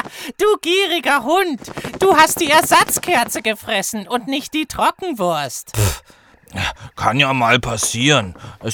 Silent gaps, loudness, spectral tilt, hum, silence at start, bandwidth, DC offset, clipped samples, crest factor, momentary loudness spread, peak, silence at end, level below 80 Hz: none; -16 LUFS; -3 dB/octave; none; 0 s; over 20 kHz; under 0.1%; under 0.1%; 18 dB; 12 LU; 0 dBFS; 0 s; -42 dBFS